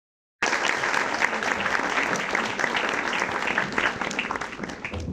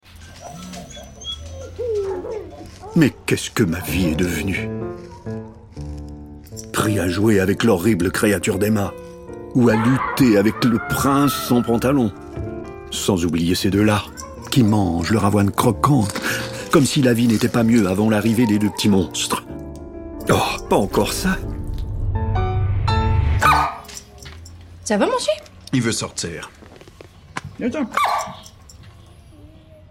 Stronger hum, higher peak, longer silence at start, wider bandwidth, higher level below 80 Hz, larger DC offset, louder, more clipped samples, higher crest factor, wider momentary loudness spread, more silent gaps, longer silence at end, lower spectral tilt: neither; second, -6 dBFS vs -2 dBFS; first, 0.4 s vs 0.15 s; about the same, 15.5 kHz vs 17 kHz; second, -52 dBFS vs -34 dBFS; neither; second, -25 LUFS vs -19 LUFS; neither; first, 22 dB vs 16 dB; second, 7 LU vs 18 LU; neither; second, 0 s vs 0.45 s; second, -2.5 dB/octave vs -5.5 dB/octave